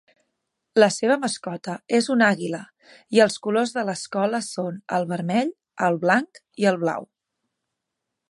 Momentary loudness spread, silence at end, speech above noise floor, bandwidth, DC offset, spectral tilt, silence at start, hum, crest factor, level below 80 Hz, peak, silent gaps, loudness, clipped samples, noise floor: 11 LU; 1.25 s; 60 dB; 11.5 kHz; under 0.1%; -4.5 dB/octave; 0.75 s; none; 20 dB; -74 dBFS; -2 dBFS; none; -23 LUFS; under 0.1%; -82 dBFS